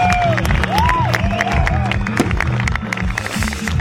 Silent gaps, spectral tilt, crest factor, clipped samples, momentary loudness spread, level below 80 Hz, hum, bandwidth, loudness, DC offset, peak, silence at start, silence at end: none; -5.5 dB/octave; 14 dB; under 0.1%; 5 LU; -24 dBFS; none; 16.5 kHz; -17 LUFS; under 0.1%; -2 dBFS; 0 s; 0 s